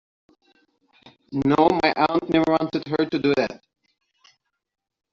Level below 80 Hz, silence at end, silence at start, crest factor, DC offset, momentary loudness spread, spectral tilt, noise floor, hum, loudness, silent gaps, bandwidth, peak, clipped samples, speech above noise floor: -56 dBFS; 1.55 s; 1.3 s; 20 dB; under 0.1%; 9 LU; -4.5 dB/octave; -63 dBFS; none; -21 LUFS; none; 7.4 kHz; -4 dBFS; under 0.1%; 43 dB